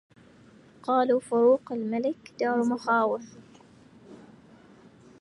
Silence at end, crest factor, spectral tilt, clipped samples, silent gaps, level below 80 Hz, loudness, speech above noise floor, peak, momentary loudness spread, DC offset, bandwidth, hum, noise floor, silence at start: 1.05 s; 16 dB; -6 dB/octave; under 0.1%; none; -72 dBFS; -26 LUFS; 29 dB; -12 dBFS; 11 LU; under 0.1%; 11 kHz; none; -54 dBFS; 0.85 s